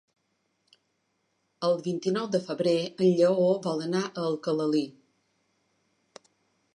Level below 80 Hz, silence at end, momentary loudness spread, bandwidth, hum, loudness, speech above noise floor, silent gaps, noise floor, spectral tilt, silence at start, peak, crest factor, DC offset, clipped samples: -78 dBFS; 1.85 s; 8 LU; 11 kHz; none; -27 LUFS; 49 dB; none; -75 dBFS; -6.5 dB/octave; 1.6 s; -10 dBFS; 18 dB; under 0.1%; under 0.1%